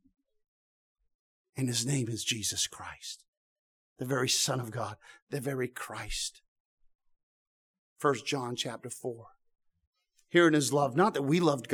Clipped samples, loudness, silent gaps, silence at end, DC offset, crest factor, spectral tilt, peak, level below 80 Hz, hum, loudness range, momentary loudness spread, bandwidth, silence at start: under 0.1%; -30 LUFS; 3.28-3.96 s, 5.22-5.27 s, 6.48-6.78 s, 6.95-6.99 s, 7.23-7.96 s, 9.87-9.93 s; 0 s; under 0.1%; 22 dB; -4 dB/octave; -10 dBFS; -58 dBFS; none; 7 LU; 16 LU; 19 kHz; 1.55 s